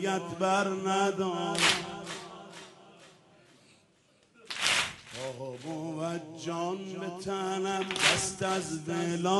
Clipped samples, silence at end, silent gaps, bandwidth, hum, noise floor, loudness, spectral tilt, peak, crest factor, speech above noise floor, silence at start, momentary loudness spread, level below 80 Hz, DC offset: under 0.1%; 0 s; none; 11.5 kHz; none; -66 dBFS; -30 LUFS; -3 dB/octave; -8 dBFS; 24 dB; 35 dB; 0 s; 15 LU; -68 dBFS; under 0.1%